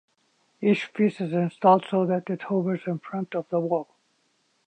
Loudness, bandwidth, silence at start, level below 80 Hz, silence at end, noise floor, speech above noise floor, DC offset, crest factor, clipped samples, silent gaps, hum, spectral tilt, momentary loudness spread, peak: -25 LUFS; 8.8 kHz; 0.6 s; -76 dBFS; 0.85 s; -69 dBFS; 45 dB; under 0.1%; 18 dB; under 0.1%; none; none; -8.5 dB/octave; 11 LU; -8 dBFS